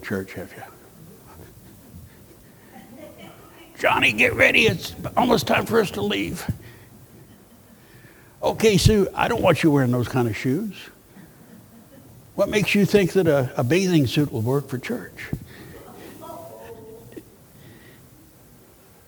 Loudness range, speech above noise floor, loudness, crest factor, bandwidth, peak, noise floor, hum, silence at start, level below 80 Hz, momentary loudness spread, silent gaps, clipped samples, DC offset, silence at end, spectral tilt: 17 LU; 30 dB; -20 LUFS; 22 dB; over 20 kHz; -2 dBFS; -51 dBFS; none; 0 s; -44 dBFS; 24 LU; none; under 0.1%; under 0.1%; 1.35 s; -5.5 dB/octave